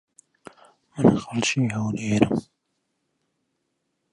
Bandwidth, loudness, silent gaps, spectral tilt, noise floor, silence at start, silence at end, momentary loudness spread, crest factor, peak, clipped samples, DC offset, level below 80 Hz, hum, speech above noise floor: 11 kHz; -23 LUFS; none; -5.5 dB/octave; -76 dBFS; 0.95 s; 1.7 s; 8 LU; 24 dB; -2 dBFS; under 0.1%; under 0.1%; -54 dBFS; none; 54 dB